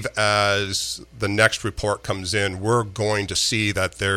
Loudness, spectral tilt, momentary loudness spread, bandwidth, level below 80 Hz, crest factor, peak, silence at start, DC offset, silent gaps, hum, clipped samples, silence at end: -21 LUFS; -3.5 dB/octave; 7 LU; 16 kHz; -46 dBFS; 20 dB; -2 dBFS; 0 s; under 0.1%; none; none; under 0.1%; 0 s